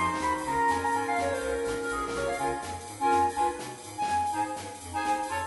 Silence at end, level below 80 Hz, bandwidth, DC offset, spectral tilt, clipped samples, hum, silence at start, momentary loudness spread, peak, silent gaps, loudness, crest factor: 0 s; -52 dBFS; 11.5 kHz; under 0.1%; -4 dB/octave; under 0.1%; none; 0 s; 9 LU; -16 dBFS; none; -29 LUFS; 14 dB